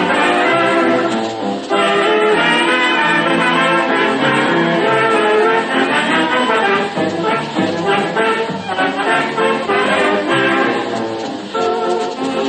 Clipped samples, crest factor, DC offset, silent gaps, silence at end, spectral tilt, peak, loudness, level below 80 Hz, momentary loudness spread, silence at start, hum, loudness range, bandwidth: under 0.1%; 12 dB; under 0.1%; none; 0 s; -4.5 dB/octave; -2 dBFS; -14 LUFS; -60 dBFS; 6 LU; 0 s; none; 3 LU; 9.2 kHz